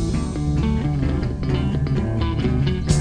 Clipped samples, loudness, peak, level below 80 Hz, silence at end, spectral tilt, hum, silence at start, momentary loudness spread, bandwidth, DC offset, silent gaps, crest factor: under 0.1%; -22 LUFS; -4 dBFS; -26 dBFS; 0 s; -7 dB/octave; none; 0 s; 2 LU; 10 kHz; under 0.1%; none; 16 dB